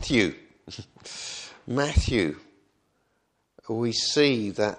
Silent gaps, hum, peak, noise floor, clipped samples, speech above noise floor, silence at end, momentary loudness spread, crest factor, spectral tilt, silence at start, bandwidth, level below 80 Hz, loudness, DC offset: none; none; -6 dBFS; -73 dBFS; under 0.1%; 47 dB; 0 s; 21 LU; 20 dB; -4.5 dB/octave; 0 s; 10.5 kHz; -38 dBFS; -26 LUFS; under 0.1%